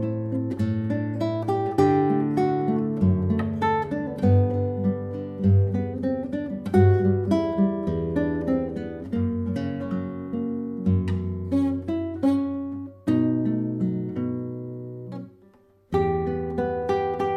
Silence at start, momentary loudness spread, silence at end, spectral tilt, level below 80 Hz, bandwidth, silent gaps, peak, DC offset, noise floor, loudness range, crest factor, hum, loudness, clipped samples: 0 s; 10 LU; 0 s; -9.5 dB/octave; -54 dBFS; 8.2 kHz; none; -6 dBFS; under 0.1%; -56 dBFS; 5 LU; 18 dB; none; -25 LUFS; under 0.1%